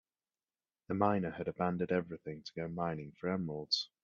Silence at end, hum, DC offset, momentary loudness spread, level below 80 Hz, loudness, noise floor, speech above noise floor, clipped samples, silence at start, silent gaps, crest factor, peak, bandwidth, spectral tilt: 0.2 s; none; under 0.1%; 10 LU; -72 dBFS; -37 LUFS; under -90 dBFS; over 54 dB; under 0.1%; 0.9 s; none; 22 dB; -16 dBFS; 7.6 kHz; -6 dB/octave